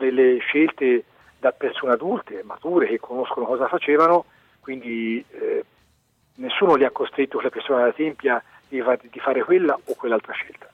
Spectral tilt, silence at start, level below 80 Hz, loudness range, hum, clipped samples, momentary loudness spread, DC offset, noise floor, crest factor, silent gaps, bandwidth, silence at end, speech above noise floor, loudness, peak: -6.5 dB/octave; 0 s; -70 dBFS; 2 LU; none; under 0.1%; 11 LU; under 0.1%; -64 dBFS; 16 dB; none; 6 kHz; 0.2 s; 42 dB; -22 LUFS; -6 dBFS